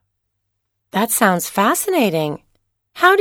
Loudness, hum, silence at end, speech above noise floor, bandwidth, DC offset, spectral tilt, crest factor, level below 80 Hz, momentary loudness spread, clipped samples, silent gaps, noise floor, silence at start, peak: -17 LUFS; none; 0 s; 57 dB; 18.5 kHz; under 0.1%; -3.5 dB/octave; 18 dB; -62 dBFS; 10 LU; under 0.1%; none; -74 dBFS; 0.95 s; 0 dBFS